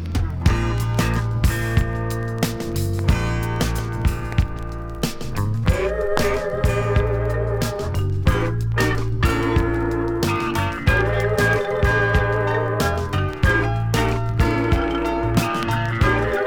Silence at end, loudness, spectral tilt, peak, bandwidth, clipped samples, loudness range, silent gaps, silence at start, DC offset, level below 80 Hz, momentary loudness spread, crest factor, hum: 0 s; -21 LUFS; -6 dB/octave; 0 dBFS; 19 kHz; under 0.1%; 3 LU; none; 0 s; under 0.1%; -28 dBFS; 5 LU; 20 dB; none